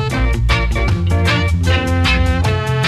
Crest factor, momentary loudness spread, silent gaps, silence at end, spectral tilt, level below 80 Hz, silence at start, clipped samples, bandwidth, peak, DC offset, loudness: 12 dB; 3 LU; none; 0 s; -5.5 dB/octave; -20 dBFS; 0 s; under 0.1%; 13 kHz; -2 dBFS; under 0.1%; -15 LUFS